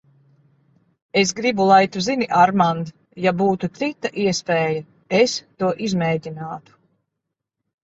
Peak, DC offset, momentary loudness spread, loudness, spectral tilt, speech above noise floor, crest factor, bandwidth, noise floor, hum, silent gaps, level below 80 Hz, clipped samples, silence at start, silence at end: -2 dBFS; under 0.1%; 13 LU; -20 LUFS; -5 dB/octave; 62 dB; 20 dB; 8 kHz; -81 dBFS; none; none; -60 dBFS; under 0.1%; 1.15 s; 1.25 s